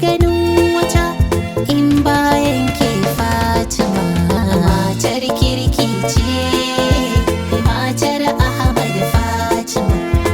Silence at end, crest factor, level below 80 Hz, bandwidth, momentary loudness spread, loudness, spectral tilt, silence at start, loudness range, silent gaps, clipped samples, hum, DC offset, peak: 0 s; 14 dB; -24 dBFS; 19.5 kHz; 4 LU; -15 LUFS; -5.5 dB/octave; 0 s; 1 LU; none; under 0.1%; none; under 0.1%; 0 dBFS